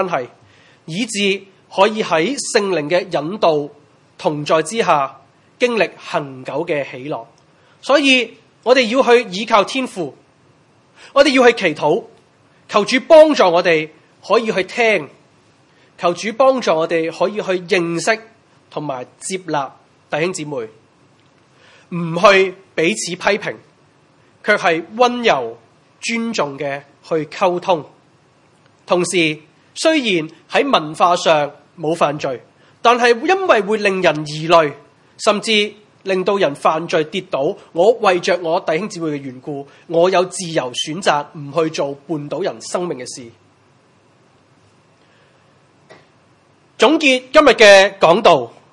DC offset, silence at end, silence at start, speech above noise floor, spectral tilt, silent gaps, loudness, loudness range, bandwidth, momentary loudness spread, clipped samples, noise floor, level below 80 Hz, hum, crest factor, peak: under 0.1%; 0.25 s; 0 s; 38 dB; -4 dB/octave; none; -16 LUFS; 7 LU; 12 kHz; 14 LU; under 0.1%; -53 dBFS; -60 dBFS; none; 18 dB; 0 dBFS